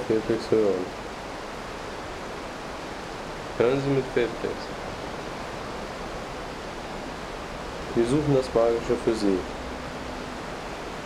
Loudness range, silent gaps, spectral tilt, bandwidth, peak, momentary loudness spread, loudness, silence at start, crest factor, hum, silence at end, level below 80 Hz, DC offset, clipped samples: 7 LU; none; -6 dB/octave; 14.5 kHz; -8 dBFS; 12 LU; -29 LUFS; 0 s; 20 dB; none; 0 s; -46 dBFS; under 0.1%; under 0.1%